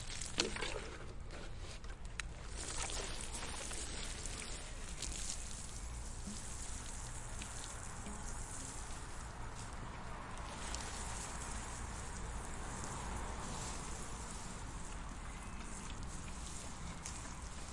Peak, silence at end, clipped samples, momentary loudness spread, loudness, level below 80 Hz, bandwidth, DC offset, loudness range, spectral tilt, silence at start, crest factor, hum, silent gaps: -16 dBFS; 0 s; under 0.1%; 7 LU; -45 LUFS; -48 dBFS; 11.5 kHz; under 0.1%; 4 LU; -3 dB/octave; 0 s; 28 dB; none; none